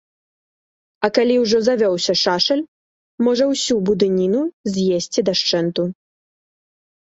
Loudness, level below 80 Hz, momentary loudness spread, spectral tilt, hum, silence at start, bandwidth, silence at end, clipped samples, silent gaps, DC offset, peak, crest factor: -18 LUFS; -58 dBFS; 7 LU; -4.5 dB/octave; none; 1 s; 8 kHz; 1.1 s; under 0.1%; 2.68-3.18 s, 4.53-4.64 s; under 0.1%; -2 dBFS; 18 dB